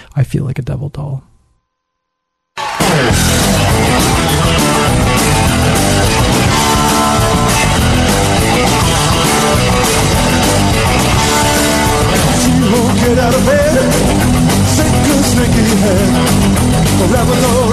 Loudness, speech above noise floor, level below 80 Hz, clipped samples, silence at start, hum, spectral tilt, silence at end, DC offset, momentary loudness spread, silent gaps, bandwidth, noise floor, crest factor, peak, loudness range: -11 LUFS; 60 dB; -22 dBFS; under 0.1%; 0.15 s; none; -4.5 dB/octave; 0 s; under 0.1%; 2 LU; none; 14 kHz; -72 dBFS; 10 dB; -2 dBFS; 2 LU